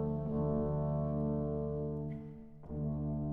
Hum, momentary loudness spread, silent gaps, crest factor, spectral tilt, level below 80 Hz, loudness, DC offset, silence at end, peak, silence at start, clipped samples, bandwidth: none; 12 LU; none; 12 dB; -13 dB/octave; -48 dBFS; -37 LUFS; under 0.1%; 0 s; -24 dBFS; 0 s; under 0.1%; 2.3 kHz